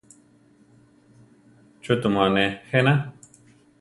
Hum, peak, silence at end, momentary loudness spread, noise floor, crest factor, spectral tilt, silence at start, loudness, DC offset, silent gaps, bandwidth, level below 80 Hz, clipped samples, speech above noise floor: none; -4 dBFS; 0.7 s; 12 LU; -57 dBFS; 22 dB; -6.5 dB/octave; 1.85 s; -22 LUFS; under 0.1%; none; 11.5 kHz; -58 dBFS; under 0.1%; 36 dB